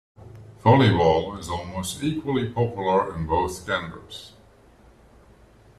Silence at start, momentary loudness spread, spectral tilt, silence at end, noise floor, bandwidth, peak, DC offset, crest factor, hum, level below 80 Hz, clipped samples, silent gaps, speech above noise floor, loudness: 0.2 s; 15 LU; -6 dB/octave; 1.5 s; -53 dBFS; 14 kHz; -4 dBFS; under 0.1%; 20 dB; none; -48 dBFS; under 0.1%; none; 30 dB; -23 LUFS